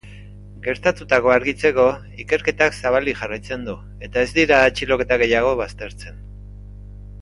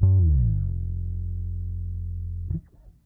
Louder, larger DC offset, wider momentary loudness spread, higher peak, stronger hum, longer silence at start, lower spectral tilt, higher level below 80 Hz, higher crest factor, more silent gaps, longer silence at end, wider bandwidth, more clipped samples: first, -19 LUFS vs -27 LUFS; neither; first, 22 LU vs 13 LU; first, 0 dBFS vs -8 dBFS; first, 50 Hz at -35 dBFS vs none; about the same, 0.05 s vs 0 s; second, -5 dB/octave vs -13.5 dB/octave; second, -40 dBFS vs -30 dBFS; about the same, 20 dB vs 16 dB; neither; second, 0 s vs 0.15 s; first, 11.5 kHz vs 1.1 kHz; neither